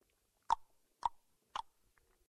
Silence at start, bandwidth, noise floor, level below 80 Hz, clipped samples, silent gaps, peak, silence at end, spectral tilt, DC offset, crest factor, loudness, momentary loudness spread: 0.5 s; 13.5 kHz; -75 dBFS; -68 dBFS; under 0.1%; none; -18 dBFS; 0.7 s; -1.5 dB/octave; under 0.1%; 26 dB; -42 LUFS; 8 LU